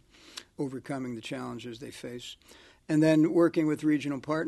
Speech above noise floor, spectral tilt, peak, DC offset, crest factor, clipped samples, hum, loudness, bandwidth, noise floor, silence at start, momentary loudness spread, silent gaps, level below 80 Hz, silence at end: 21 dB; -6.5 dB/octave; -10 dBFS; under 0.1%; 18 dB; under 0.1%; none; -28 LUFS; 12.5 kHz; -49 dBFS; 0.35 s; 21 LU; none; -66 dBFS; 0 s